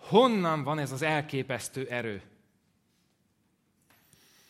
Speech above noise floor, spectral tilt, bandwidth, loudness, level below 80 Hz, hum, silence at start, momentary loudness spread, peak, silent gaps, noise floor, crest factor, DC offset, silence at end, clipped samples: 44 dB; -5.5 dB/octave; 16 kHz; -29 LUFS; -74 dBFS; none; 0 s; 11 LU; -8 dBFS; none; -72 dBFS; 24 dB; under 0.1%; 2.3 s; under 0.1%